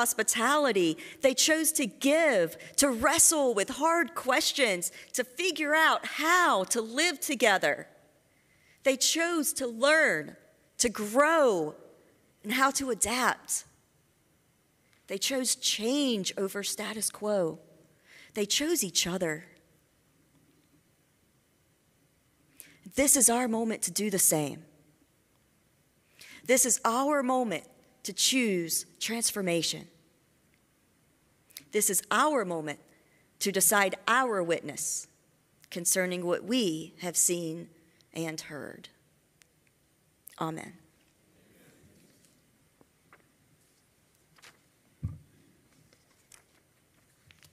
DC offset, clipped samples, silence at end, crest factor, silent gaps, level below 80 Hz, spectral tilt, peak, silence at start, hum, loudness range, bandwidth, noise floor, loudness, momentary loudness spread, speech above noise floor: under 0.1%; under 0.1%; 2.35 s; 22 dB; none; -66 dBFS; -2 dB/octave; -8 dBFS; 0 s; none; 10 LU; 16 kHz; -69 dBFS; -27 LUFS; 15 LU; 41 dB